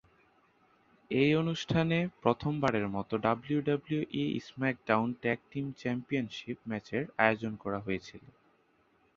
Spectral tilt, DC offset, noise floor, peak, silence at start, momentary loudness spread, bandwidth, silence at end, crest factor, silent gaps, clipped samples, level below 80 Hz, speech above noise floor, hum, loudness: -7 dB/octave; under 0.1%; -69 dBFS; -8 dBFS; 1.1 s; 9 LU; 7.6 kHz; 0.85 s; 26 dB; none; under 0.1%; -62 dBFS; 38 dB; none; -32 LUFS